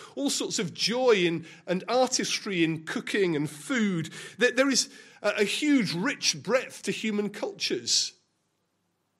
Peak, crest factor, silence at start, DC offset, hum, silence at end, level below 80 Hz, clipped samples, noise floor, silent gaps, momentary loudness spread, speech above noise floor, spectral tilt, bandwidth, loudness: -10 dBFS; 18 dB; 0 s; under 0.1%; none; 1.1 s; -76 dBFS; under 0.1%; -76 dBFS; none; 9 LU; 48 dB; -3 dB/octave; 15.5 kHz; -27 LUFS